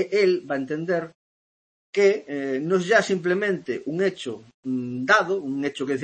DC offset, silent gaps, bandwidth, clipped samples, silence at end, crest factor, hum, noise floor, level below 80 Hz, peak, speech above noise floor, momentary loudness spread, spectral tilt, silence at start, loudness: under 0.1%; 1.15-1.93 s, 4.54-4.63 s; 8.8 kHz; under 0.1%; 0 s; 18 dB; none; under -90 dBFS; -72 dBFS; -6 dBFS; over 67 dB; 10 LU; -5 dB/octave; 0 s; -23 LUFS